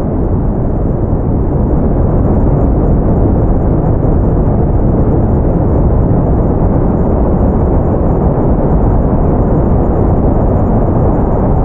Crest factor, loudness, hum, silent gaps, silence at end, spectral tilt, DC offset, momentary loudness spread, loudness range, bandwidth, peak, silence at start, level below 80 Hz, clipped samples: 8 dB; -12 LUFS; none; none; 0 s; -13.5 dB/octave; under 0.1%; 2 LU; 1 LU; 2.7 kHz; 0 dBFS; 0 s; -14 dBFS; under 0.1%